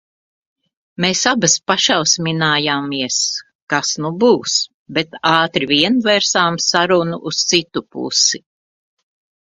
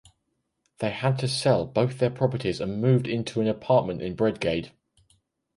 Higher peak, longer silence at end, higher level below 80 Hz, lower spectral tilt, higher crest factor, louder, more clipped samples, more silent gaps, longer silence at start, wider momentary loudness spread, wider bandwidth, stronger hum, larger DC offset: first, 0 dBFS vs -8 dBFS; first, 1.15 s vs 0.9 s; second, -60 dBFS vs -54 dBFS; second, -2.5 dB/octave vs -6.5 dB/octave; about the same, 18 dB vs 18 dB; first, -15 LUFS vs -25 LUFS; neither; first, 3.55-3.67 s, 4.74-4.86 s vs none; first, 1 s vs 0.8 s; about the same, 7 LU vs 8 LU; about the same, 10.5 kHz vs 11.5 kHz; neither; neither